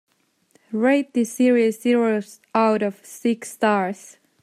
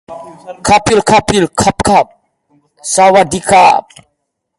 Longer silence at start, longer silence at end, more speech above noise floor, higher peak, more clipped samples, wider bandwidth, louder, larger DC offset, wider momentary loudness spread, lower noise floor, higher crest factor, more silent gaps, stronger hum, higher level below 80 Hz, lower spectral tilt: first, 0.7 s vs 0.1 s; second, 0.5 s vs 0.8 s; second, 41 dB vs 59 dB; second, -4 dBFS vs 0 dBFS; neither; first, 15 kHz vs 11.5 kHz; second, -21 LUFS vs -10 LUFS; neither; second, 9 LU vs 17 LU; second, -62 dBFS vs -69 dBFS; about the same, 16 dB vs 12 dB; neither; neither; second, -76 dBFS vs -38 dBFS; first, -5 dB/octave vs -3.5 dB/octave